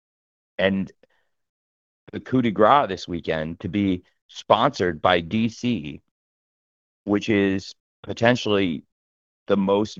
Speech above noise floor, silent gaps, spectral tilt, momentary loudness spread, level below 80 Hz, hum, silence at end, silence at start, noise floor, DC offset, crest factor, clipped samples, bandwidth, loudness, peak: over 68 dB; 1.49-2.07 s, 4.22-4.29 s, 6.11-7.05 s, 7.80-8.03 s, 8.92-9.46 s; -6 dB/octave; 18 LU; -56 dBFS; none; 0.05 s; 0.6 s; under -90 dBFS; under 0.1%; 22 dB; under 0.1%; 7.6 kHz; -22 LUFS; 0 dBFS